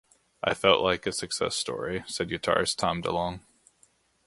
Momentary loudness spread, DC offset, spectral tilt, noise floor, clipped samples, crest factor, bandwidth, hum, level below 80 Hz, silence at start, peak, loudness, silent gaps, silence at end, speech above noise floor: 10 LU; under 0.1%; -3 dB/octave; -65 dBFS; under 0.1%; 24 dB; 11.5 kHz; none; -54 dBFS; 0.45 s; -4 dBFS; -27 LUFS; none; 0.9 s; 38 dB